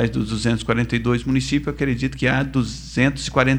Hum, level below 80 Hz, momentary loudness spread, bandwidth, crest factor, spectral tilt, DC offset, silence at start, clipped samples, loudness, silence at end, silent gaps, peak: none; -36 dBFS; 4 LU; 10.5 kHz; 18 dB; -6 dB/octave; under 0.1%; 0 s; under 0.1%; -21 LUFS; 0 s; none; -2 dBFS